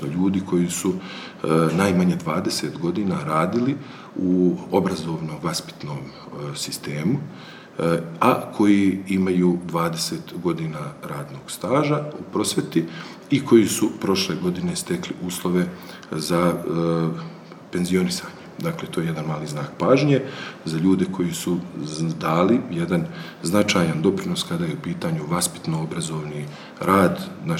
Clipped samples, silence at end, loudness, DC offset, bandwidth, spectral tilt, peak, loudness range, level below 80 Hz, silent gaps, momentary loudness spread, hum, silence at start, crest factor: under 0.1%; 0 s; -23 LUFS; under 0.1%; 17 kHz; -5.5 dB/octave; -2 dBFS; 4 LU; -58 dBFS; none; 13 LU; none; 0 s; 20 dB